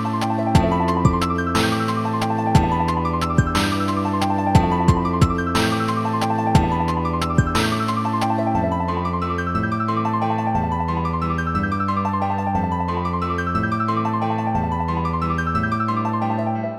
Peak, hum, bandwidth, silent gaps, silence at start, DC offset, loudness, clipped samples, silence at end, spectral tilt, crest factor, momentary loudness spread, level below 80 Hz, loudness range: -2 dBFS; none; 14.5 kHz; none; 0 s; under 0.1%; -21 LUFS; under 0.1%; 0 s; -6.5 dB/octave; 18 dB; 4 LU; -36 dBFS; 3 LU